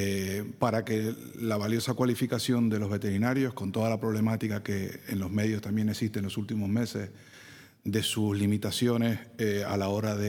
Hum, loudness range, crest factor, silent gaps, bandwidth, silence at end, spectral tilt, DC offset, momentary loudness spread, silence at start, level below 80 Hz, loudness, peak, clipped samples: none; 3 LU; 20 dB; none; 19 kHz; 0 s; -6 dB/octave; under 0.1%; 7 LU; 0 s; -68 dBFS; -30 LUFS; -10 dBFS; under 0.1%